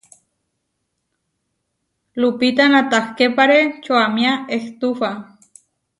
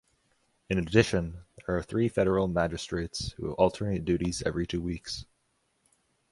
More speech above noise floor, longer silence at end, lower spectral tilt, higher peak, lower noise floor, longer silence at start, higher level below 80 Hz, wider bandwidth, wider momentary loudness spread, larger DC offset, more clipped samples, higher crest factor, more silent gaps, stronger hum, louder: first, 57 dB vs 45 dB; second, 0.75 s vs 1.1 s; second, -4 dB/octave vs -6 dB/octave; first, 0 dBFS vs -6 dBFS; about the same, -74 dBFS vs -74 dBFS; first, 2.15 s vs 0.7 s; second, -66 dBFS vs -46 dBFS; about the same, 11.5 kHz vs 11.5 kHz; about the same, 11 LU vs 10 LU; neither; neither; second, 18 dB vs 24 dB; neither; neither; first, -16 LUFS vs -29 LUFS